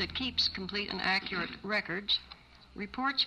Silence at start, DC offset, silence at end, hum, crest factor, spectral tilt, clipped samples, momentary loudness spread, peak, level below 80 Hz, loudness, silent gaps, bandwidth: 0 s; under 0.1%; 0 s; none; 16 dB; -4 dB/octave; under 0.1%; 15 LU; -18 dBFS; -58 dBFS; -32 LUFS; none; 14 kHz